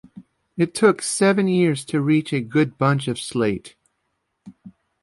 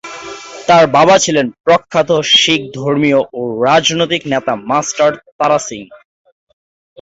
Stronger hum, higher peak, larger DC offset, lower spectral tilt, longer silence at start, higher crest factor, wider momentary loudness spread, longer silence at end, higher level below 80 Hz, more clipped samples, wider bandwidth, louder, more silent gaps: neither; second, -4 dBFS vs 0 dBFS; neither; first, -5.5 dB/octave vs -3.5 dB/octave; about the same, 0.15 s vs 0.05 s; about the same, 16 dB vs 14 dB; second, 7 LU vs 12 LU; second, 0.3 s vs 1.05 s; second, -60 dBFS vs -54 dBFS; neither; first, 11.5 kHz vs 8 kHz; second, -20 LUFS vs -12 LUFS; second, none vs 1.60-1.64 s, 5.32-5.39 s